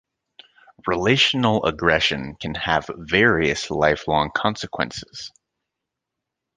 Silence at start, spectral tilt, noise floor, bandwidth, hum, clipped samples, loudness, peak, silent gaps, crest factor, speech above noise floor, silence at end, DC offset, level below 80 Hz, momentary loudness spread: 0.85 s; -4.5 dB/octave; -83 dBFS; 9.8 kHz; none; under 0.1%; -20 LUFS; -2 dBFS; none; 20 dB; 62 dB; 1.3 s; under 0.1%; -46 dBFS; 14 LU